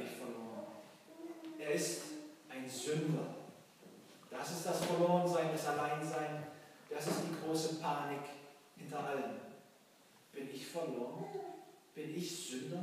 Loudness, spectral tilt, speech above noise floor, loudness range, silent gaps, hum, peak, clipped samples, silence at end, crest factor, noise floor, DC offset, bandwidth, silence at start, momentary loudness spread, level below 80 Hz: -40 LUFS; -4.5 dB/octave; 27 dB; 8 LU; none; none; -20 dBFS; under 0.1%; 0 s; 22 dB; -65 dBFS; under 0.1%; 15.5 kHz; 0 s; 20 LU; under -90 dBFS